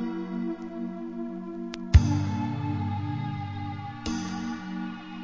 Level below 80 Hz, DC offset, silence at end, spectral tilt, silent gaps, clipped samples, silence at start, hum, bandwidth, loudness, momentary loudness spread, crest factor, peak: -34 dBFS; 0.2%; 0 s; -7 dB/octave; none; under 0.1%; 0 s; none; 7.6 kHz; -30 LUFS; 14 LU; 24 dB; -4 dBFS